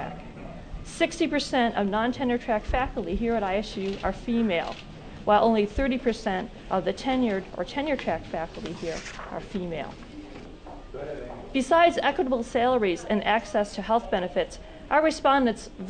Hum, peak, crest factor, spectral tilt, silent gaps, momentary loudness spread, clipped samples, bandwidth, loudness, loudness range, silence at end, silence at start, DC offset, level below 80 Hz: none; -10 dBFS; 18 dB; -5 dB/octave; none; 19 LU; under 0.1%; 9.4 kHz; -26 LUFS; 8 LU; 0 s; 0 s; under 0.1%; -42 dBFS